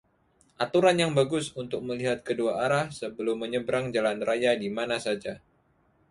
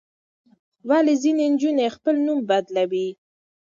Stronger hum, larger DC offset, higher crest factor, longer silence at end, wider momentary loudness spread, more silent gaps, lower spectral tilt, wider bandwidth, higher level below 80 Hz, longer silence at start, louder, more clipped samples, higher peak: neither; neither; first, 20 dB vs 14 dB; first, 0.75 s vs 0.55 s; first, 11 LU vs 7 LU; neither; about the same, -5 dB/octave vs -5 dB/octave; first, 11.5 kHz vs 7.6 kHz; first, -64 dBFS vs -76 dBFS; second, 0.6 s vs 0.85 s; second, -27 LUFS vs -21 LUFS; neither; about the same, -8 dBFS vs -8 dBFS